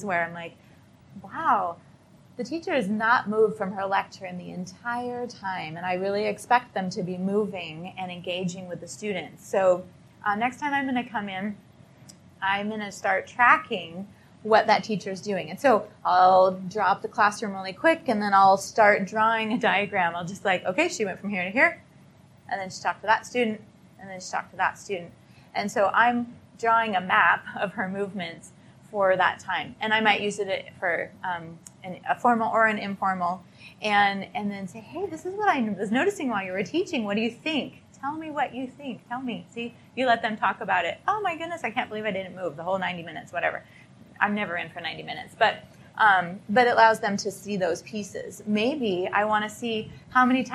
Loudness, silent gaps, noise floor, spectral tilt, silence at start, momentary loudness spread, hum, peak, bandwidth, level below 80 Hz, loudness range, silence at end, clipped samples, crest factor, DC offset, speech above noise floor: -25 LUFS; none; -53 dBFS; -4.5 dB/octave; 0 s; 15 LU; none; -4 dBFS; 13 kHz; -70 dBFS; 7 LU; 0 s; under 0.1%; 22 dB; under 0.1%; 28 dB